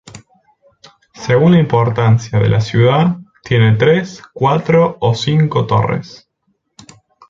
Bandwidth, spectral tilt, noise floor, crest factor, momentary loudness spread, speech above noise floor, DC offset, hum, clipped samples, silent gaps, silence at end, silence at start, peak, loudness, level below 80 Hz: 7.6 kHz; -7.5 dB/octave; -66 dBFS; 14 dB; 7 LU; 53 dB; under 0.1%; none; under 0.1%; none; 1.2 s; 0.15 s; 0 dBFS; -13 LUFS; -44 dBFS